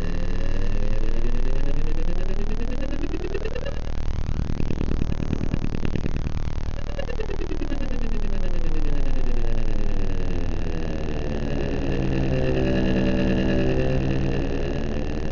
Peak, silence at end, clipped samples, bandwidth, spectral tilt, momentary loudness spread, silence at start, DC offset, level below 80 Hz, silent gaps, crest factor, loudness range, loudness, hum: -6 dBFS; 0 s; under 0.1%; 6.8 kHz; -7.5 dB/octave; 8 LU; 0 s; under 0.1%; -22 dBFS; none; 14 dB; 6 LU; -27 LUFS; none